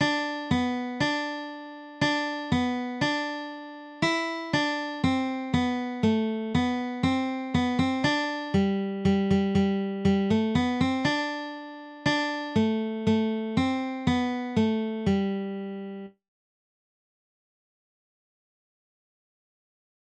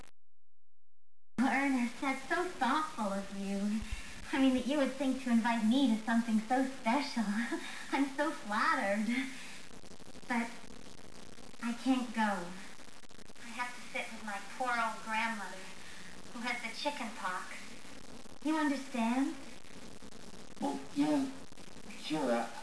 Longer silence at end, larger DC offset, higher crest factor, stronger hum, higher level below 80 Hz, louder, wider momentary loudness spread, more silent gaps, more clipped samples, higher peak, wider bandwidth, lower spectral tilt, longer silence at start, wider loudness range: first, 3.95 s vs 0 s; second, under 0.1% vs 0.5%; about the same, 16 dB vs 18 dB; neither; first, -54 dBFS vs -62 dBFS; first, -27 LUFS vs -35 LUFS; second, 11 LU vs 21 LU; neither; neither; first, -12 dBFS vs -18 dBFS; second, 9.4 kHz vs 11 kHz; first, -6 dB/octave vs -4.5 dB/octave; about the same, 0 s vs 0 s; about the same, 5 LU vs 6 LU